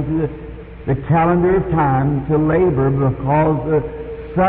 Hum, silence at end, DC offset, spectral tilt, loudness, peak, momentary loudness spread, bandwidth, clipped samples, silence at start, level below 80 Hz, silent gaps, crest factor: none; 0 s; under 0.1%; -14 dB/octave; -17 LUFS; -6 dBFS; 13 LU; 3.9 kHz; under 0.1%; 0 s; -34 dBFS; none; 12 dB